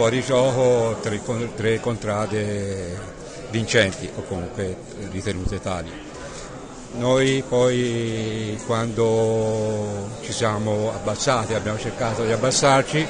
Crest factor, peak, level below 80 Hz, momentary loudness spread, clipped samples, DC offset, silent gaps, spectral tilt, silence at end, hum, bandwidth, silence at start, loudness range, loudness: 18 dB; -4 dBFS; -44 dBFS; 14 LU; under 0.1%; under 0.1%; none; -5 dB/octave; 0 s; none; 10 kHz; 0 s; 4 LU; -22 LUFS